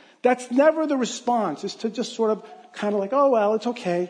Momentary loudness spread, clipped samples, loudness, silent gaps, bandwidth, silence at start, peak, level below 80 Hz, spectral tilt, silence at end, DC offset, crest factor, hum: 10 LU; under 0.1%; -23 LUFS; none; 10.5 kHz; 0.25 s; -6 dBFS; -82 dBFS; -5 dB/octave; 0 s; under 0.1%; 16 dB; none